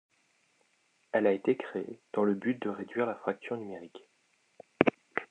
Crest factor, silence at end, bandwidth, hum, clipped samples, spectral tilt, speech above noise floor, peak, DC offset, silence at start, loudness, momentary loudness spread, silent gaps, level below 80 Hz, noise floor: 30 dB; 0.05 s; 9.2 kHz; none; under 0.1%; -7.5 dB/octave; 40 dB; -4 dBFS; under 0.1%; 1.15 s; -32 LUFS; 11 LU; none; -80 dBFS; -72 dBFS